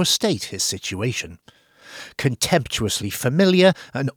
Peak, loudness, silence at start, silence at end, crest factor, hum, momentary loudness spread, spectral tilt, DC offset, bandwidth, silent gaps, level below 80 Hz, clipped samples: -4 dBFS; -20 LUFS; 0 s; 0.05 s; 18 dB; none; 16 LU; -4 dB/octave; under 0.1%; over 20 kHz; none; -50 dBFS; under 0.1%